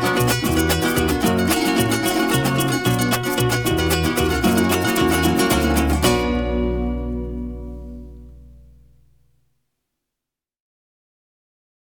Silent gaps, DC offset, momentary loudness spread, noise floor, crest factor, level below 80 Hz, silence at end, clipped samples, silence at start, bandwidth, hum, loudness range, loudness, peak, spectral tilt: none; 0.3%; 11 LU; -86 dBFS; 18 dB; -32 dBFS; 3.35 s; under 0.1%; 0 s; over 20 kHz; none; 12 LU; -19 LUFS; -2 dBFS; -4.5 dB/octave